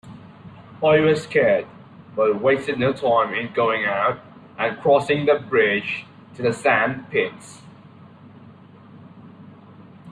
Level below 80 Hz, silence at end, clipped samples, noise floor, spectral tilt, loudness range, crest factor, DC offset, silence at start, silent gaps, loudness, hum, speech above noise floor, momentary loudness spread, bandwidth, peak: -60 dBFS; 0 s; under 0.1%; -45 dBFS; -6 dB/octave; 5 LU; 18 dB; under 0.1%; 0.05 s; none; -20 LUFS; none; 26 dB; 13 LU; 10.5 kHz; -4 dBFS